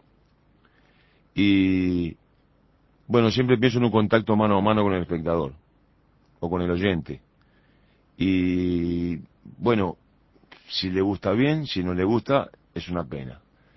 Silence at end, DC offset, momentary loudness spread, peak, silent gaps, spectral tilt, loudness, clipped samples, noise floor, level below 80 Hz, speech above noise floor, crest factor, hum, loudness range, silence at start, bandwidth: 0.4 s; under 0.1%; 14 LU; -4 dBFS; none; -7.5 dB/octave; -24 LUFS; under 0.1%; -61 dBFS; -46 dBFS; 39 dB; 20 dB; none; 5 LU; 1.35 s; 6 kHz